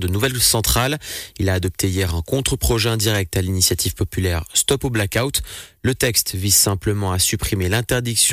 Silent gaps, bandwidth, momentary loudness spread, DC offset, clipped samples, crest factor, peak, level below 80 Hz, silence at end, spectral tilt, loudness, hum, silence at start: none; 16 kHz; 7 LU; under 0.1%; under 0.1%; 16 dB; -4 dBFS; -34 dBFS; 0 s; -3.5 dB/octave; -18 LUFS; none; 0 s